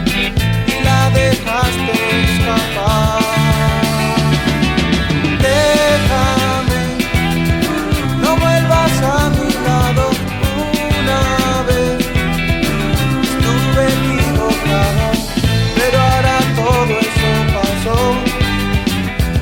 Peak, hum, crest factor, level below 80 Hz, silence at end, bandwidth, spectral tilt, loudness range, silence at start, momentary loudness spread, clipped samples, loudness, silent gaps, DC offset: -2 dBFS; none; 12 dB; -24 dBFS; 0 s; 17.5 kHz; -5 dB/octave; 1 LU; 0 s; 4 LU; under 0.1%; -14 LUFS; none; under 0.1%